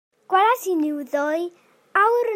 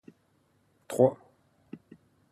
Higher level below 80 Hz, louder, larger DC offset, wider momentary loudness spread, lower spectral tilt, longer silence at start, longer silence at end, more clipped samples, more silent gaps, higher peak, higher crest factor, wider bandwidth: second, -82 dBFS vs -74 dBFS; first, -21 LUFS vs -27 LUFS; neither; second, 7 LU vs 25 LU; second, -2 dB/octave vs -7.5 dB/octave; second, 0.3 s vs 0.9 s; second, 0 s vs 0.55 s; neither; neither; first, -4 dBFS vs -8 dBFS; second, 16 dB vs 24 dB; first, 16 kHz vs 13 kHz